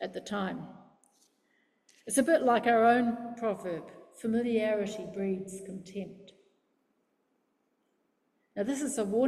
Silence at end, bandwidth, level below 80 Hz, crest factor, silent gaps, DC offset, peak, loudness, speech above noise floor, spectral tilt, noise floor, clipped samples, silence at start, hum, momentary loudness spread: 0 s; 14.5 kHz; -74 dBFS; 18 dB; none; under 0.1%; -14 dBFS; -30 LUFS; 46 dB; -4.5 dB/octave; -76 dBFS; under 0.1%; 0 s; none; 18 LU